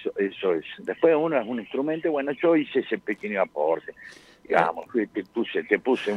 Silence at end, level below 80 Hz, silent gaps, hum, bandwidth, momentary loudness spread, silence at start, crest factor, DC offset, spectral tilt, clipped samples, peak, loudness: 0 s; -70 dBFS; none; none; 10.5 kHz; 8 LU; 0 s; 20 dB; under 0.1%; -6.5 dB/octave; under 0.1%; -4 dBFS; -25 LUFS